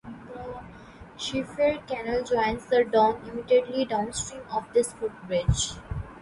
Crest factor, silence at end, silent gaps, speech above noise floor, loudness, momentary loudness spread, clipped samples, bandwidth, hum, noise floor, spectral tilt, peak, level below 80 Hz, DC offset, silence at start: 18 dB; 0 s; none; 21 dB; -26 LUFS; 17 LU; under 0.1%; 11.5 kHz; none; -46 dBFS; -4.5 dB/octave; -10 dBFS; -42 dBFS; under 0.1%; 0.05 s